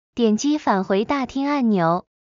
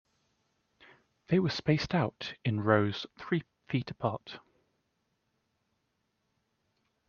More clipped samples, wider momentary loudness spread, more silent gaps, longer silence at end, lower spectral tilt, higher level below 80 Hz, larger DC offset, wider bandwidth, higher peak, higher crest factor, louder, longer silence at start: neither; second, 4 LU vs 11 LU; neither; second, 0.25 s vs 2.7 s; about the same, -5.5 dB/octave vs -5.5 dB/octave; first, -56 dBFS vs -66 dBFS; neither; about the same, 7.6 kHz vs 7.2 kHz; about the same, -6 dBFS vs -8 dBFS; second, 14 dB vs 26 dB; first, -20 LUFS vs -31 LUFS; second, 0.15 s vs 1.3 s